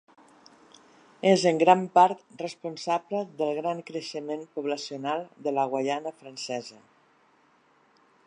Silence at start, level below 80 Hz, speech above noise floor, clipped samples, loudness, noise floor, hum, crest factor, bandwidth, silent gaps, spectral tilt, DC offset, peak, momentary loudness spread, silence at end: 1.25 s; -82 dBFS; 37 dB; under 0.1%; -27 LUFS; -63 dBFS; none; 24 dB; 10.5 kHz; none; -5 dB/octave; under 0.1%; -4 dBFS; 15 LU; 1.55 s